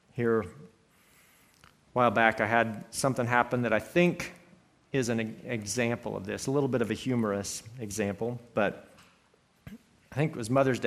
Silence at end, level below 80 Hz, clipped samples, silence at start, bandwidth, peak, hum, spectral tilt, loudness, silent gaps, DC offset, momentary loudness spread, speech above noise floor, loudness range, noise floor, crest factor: 0 s; -64 dBFS; under 0.1%; 0.15 s; 15.5 kHz; -6 dBFS; none; -5 dB/octave; -29 LUFS; none; under 0.1%; 11 LU; 37 dB; 6 LU; -66 dBFS; 24 dB